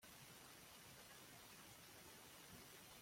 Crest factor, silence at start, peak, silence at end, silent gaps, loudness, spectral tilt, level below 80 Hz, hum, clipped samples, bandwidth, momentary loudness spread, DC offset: 16 dB; 0 s; -46 dBFS; 0 s; none; -60 LUFS; -2 dB/octave; -82 dBFS; none; under 0.1%; 16.5 kHz; 1 LU; under 0.1%